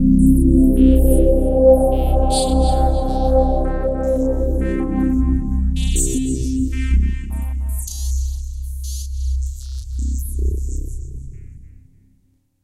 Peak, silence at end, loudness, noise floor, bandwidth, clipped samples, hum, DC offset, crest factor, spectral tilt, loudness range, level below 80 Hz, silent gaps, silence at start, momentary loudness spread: 0 dBFS; 0.95 s; -18 LUFS; -59 dBFS; 14.5 kHz; under 0.1%; none; under 0.1%; 16 dB; -7 dB/octave; 11 LU; -20 dBFS; none; 0 s; 15 LU